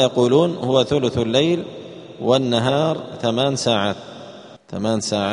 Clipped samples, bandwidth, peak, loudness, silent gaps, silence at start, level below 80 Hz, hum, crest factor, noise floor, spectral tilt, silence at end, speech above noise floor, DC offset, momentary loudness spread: under 0.1%; 10.5 kHz; -2 dBFS; -19 LUFS; none; 0 s; -54 dBFS; none; 18 dB; -40 dBFS; -5 dB/octave; 0 s; 21 dB; under 0.1%; 17 LU